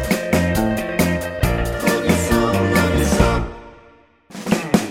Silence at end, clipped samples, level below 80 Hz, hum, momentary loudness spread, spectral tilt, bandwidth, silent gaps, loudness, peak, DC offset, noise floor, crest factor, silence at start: 0 s; under 0.1%; -28 dBFS; none; 7 LU; -5.5 dB/octave; 16.5 kHz; none; -18 LUFS; 0 dBFS; under 0.1%; -50 dBFS; 18 dB; 0 s